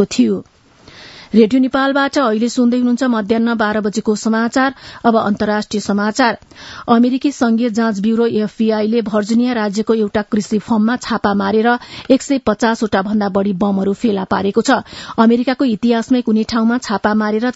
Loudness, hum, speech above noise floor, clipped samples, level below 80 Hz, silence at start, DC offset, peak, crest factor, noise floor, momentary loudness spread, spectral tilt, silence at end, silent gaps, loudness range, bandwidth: -15 LUFS; none; 28 dB; under 0.1%; -50 dBFS; 0 s; under 0.1%; 0 dBFS; 14 dB; -42 dBFS; 4 LU; -5.5 dB/octave; 0.05 s; none; 1 LU; 8 kHz